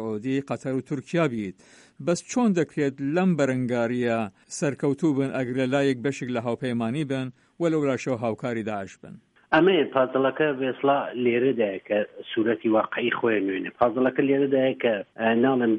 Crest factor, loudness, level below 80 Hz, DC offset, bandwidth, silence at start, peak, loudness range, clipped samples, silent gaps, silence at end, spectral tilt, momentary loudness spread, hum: 18 dB; -25 LUFS; -66 dBFS; under 0.1%; 11 kHz; 0 s; -8 dBFS; 3 LU; under 0.1%; none; 0 s; -6 dB/octave; 7 LU; none